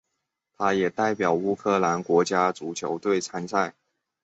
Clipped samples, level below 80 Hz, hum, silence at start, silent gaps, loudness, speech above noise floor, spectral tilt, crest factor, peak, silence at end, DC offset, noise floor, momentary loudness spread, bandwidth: under 0.1%; -66 dBFS; none; 0.6 s; none; -25 LUFS; 56 dB; -5 dB/octave; 18 dB; -8 dBFS; 0.55 s; under 0.1%; -81 dBFS; 6 LU; 8.2 kHz